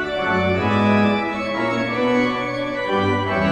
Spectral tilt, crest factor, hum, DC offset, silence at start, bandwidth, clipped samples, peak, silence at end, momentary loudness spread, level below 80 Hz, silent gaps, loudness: -6.5 dB/octave; 14 dB; none; under 0.1%; 0 s; 9.4 kHz; under 0.1%; -4 dBFS; 0 s; 6 LU; -48 dBFS; none; -20 LUFS